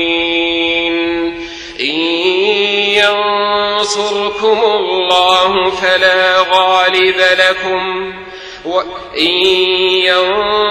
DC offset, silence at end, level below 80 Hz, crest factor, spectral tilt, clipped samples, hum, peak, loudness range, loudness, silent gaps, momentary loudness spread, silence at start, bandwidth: under 0.1%; 0 s; -46 dBFS; 12 dB; -2.5 dB/octave; under 0.1%; none; 0 dBFS; 3 LU; -11 LUFS; none; 9 LU; 0 s; 14 kHz